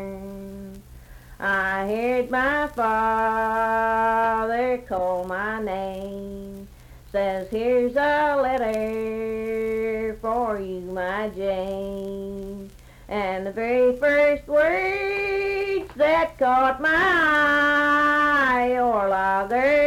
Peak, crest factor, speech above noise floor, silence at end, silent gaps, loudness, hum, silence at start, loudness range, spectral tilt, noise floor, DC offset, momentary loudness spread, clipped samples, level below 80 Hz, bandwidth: -10 dBFS; 14 dB; 23 dB; 0 s; none; -22 LUFS; none; 0 s; 8 LU; -5.5 dB/octave; -45 dBFS; under 0.1%; 14 LU; under 0.1%; -48 dBFS; 16.5 kHz